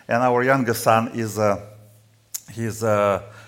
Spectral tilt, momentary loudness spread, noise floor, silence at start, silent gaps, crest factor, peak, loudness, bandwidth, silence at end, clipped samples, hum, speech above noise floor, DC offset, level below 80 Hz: -5.5 dB/octave; 12 LU; -53 dBFS; 0.1 s; none; 18 dB; -2 dBFS; -21 LUFS; 17 kHz; 0 s; under 0.1%; none; 33 dB; under 0.1%; -60 dBFS